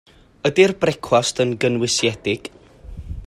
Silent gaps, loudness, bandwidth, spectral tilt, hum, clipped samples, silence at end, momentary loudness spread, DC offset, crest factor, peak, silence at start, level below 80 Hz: none; -19 LUFS; 13 kHz; -4 dB/octave; none; under 0.1%; 0 s; 15 LU; under 0.1%; 20 dB; -2 dBFS; 0.45 s; -42 dBFS